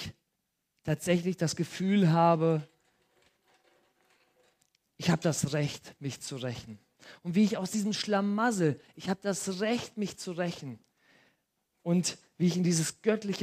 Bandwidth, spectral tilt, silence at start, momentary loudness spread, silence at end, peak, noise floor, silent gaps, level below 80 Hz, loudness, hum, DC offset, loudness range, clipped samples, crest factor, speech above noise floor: 15.5 kHz; -5.5 dB/octave; 0 s; 14 LU; 0 s; -12 dBFS; -81 dBFS; none; -68 dBFS; -30 LUFS; none; under 0.1%; 6 LU; under 0.1%; 20 dB; 52 dB